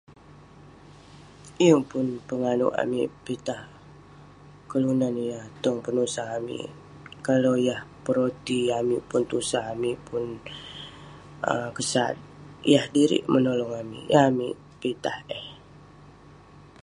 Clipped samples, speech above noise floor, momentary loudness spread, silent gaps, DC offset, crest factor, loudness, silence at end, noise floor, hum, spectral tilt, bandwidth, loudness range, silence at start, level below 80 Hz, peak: under 0.1%; 25 dB; 17 LU; none; under 0.1%; 24 dB; -26 LUFS; 0.25 s; -50 dBFS; 50 Hz at -60 dBFS; -5 dB/octave; 11.5 kHz; 5 LU; 0.1 s; -60 dBFS; -4 dBFS